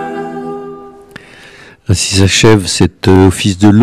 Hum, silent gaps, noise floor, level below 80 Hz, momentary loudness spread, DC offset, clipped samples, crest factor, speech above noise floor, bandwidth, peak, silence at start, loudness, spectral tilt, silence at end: none; none; -37 dBFS; -34 dBFS; 17 LU; under 0.1%; 1%; 10 dB; 29 dB; 14.5 kHz; 0 dBFS; 0 s; -9 LUFS; -5 dB/octave; 0 s